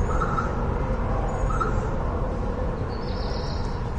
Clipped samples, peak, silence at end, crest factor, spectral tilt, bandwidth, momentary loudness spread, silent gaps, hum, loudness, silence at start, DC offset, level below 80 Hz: under 0.1%; -12 dBFS; 0 s; 14 dB; -7.5 dB/octave; 8.8 kHz; 4 LU; none; none; -28 LUFS; 0 s; under 0.1%; -28 dBFS